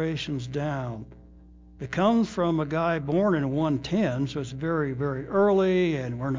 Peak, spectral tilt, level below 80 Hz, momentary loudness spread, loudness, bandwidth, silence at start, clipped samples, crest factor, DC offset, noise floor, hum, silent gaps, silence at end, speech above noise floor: -10 dBFS; -7.5 dB/octave; -52 dBFS; 9 LU; -26 LUFS; 7.6 kHz; 0 s; under 0.1%; 16 dB; under 0.1%; -50 dBFS; none; none; 0 s; 24 dB